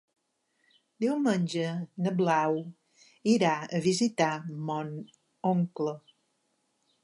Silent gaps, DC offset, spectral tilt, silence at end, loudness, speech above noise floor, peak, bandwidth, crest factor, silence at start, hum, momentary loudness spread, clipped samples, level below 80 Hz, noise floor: none; under 0.1%; -6 dB/octave; 1.05 s; -29 LUFS; 47 dB; -12 dBFS; 11.5 kHz; 18 dB; 1 s; none; 9 LU; under 0.1%; -78 dBFS; -75 dBFS